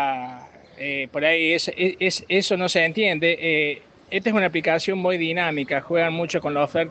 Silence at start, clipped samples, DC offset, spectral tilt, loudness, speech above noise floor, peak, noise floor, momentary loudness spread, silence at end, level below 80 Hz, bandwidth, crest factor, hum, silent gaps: 0 s; under 0.1%; under 0.1%; -4.5 dB/octave; -22 LUFS; 21 dB; -6 dBFS; -43 dBFS; 7 LU; 0 s; -64 dBFS; 9 kHz; 16 dB; none; none